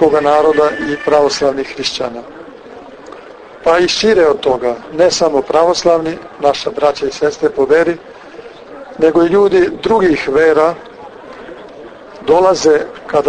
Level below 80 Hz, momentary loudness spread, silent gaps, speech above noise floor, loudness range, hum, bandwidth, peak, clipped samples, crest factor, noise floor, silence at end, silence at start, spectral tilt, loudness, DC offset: -46 dBFS; 23 LU; none; 22 dB; 3 LU; none; 9.6 kHz; 0 dBFS; under 0.1%; 14 dB; -34 dBFS; 0 s; 0 s; -4 dB/octave; -13 LUFS; under 0.1%